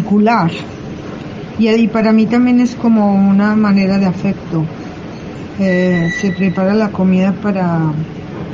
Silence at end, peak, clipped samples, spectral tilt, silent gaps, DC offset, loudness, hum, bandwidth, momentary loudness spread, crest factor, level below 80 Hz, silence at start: 0 s; -2 dBFS; under 0.1%; -8 dB/octave; none; under 0.1%; -13 LUFS; none; 7.4 kHz; 16 LU; 10 dB; -44 dBFS; 0 s